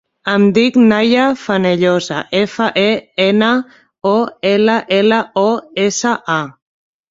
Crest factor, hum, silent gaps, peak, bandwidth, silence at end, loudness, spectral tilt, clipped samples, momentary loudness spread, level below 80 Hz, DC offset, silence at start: 12 dB; none; none; -2 dBFS; 7.8 kHz; 0.6 s; -14 LUFS; -5 dB/octave; under 0.1%; 7 LU; -56 dBFS; under 0.1%; 0.25 s